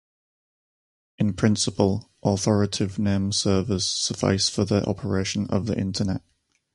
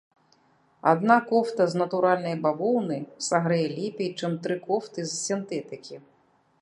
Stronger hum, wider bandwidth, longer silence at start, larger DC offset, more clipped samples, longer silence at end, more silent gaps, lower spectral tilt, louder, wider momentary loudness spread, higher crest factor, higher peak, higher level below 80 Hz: neither; about the same, 11.5 kHz vs 11.5 kHz; first, 1.2 s vs 0.85 s; neither; neither; about the same, 0.55 s vs 0.6 s; neither; about the same, -5 dB/octave vs -5 dB/octave; about the same, -24 LUFS vs -26 LUFS; second, 5 LU vs 12 LU; about the same, 20 dB vs 22 dB; about the same, -4 dBFS vs -4 dBFS; first, -46 dBFS vs -76 dBFS